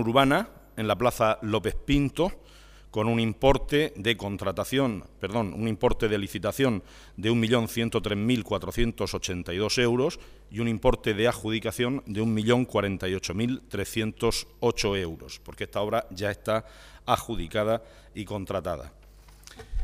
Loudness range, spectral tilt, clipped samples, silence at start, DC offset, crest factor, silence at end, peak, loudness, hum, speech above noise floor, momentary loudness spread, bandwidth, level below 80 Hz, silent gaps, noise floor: 4 LU; -5.5 dB/octave; under 0.1%; 0 s; under 0.1%; 22 dB; 0 s; -6 dBFS; -27 LUFS; none; 24 dB; 11 LU; 15.5 kHz; -40 dBFS; none; -50 dBFS